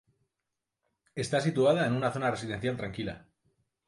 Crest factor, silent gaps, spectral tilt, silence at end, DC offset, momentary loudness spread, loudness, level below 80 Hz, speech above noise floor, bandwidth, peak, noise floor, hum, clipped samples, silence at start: 18 dB; none; -6 dB/octave; 0.7 s; under 0.1%; 13 LU; -30 LUFS; -60 dBFS; 57 dB; 11.5 kHz; -14 dBFS; -86 dBFS; none; under 0.1%; 1.15 s